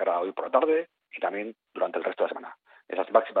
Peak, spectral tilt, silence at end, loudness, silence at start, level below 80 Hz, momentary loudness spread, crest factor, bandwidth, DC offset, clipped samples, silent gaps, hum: -6 dBFS; -2 dB/octave; 0 s; -28 LUFS; 0 s; -84 dBFS; 15 LU; 22 dB; 4.3 kHz; under 0.1%; under 0.1%; none; none